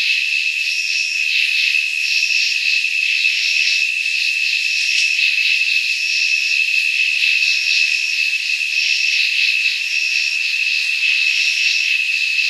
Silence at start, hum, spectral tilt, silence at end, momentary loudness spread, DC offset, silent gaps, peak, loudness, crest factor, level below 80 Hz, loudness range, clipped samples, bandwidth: 0 s; none; 15.5 dB/octave; 0 s; 3 LU; under 0.1%; none; -2 dBFS; -14 LUFS; 14 dB; under -90 dBFS; 1 LU; under 0.1%; 14.5 kHz